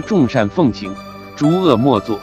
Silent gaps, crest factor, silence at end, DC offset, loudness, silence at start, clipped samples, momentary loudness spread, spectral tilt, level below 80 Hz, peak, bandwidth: none; 16 dB; 0 s; under 0.1%; -15 LUFS; 0 s; under 0.1%; 16 LU; -7.5 dB/octave; -46 dBFS; 0 dBFS; 14.5 kHz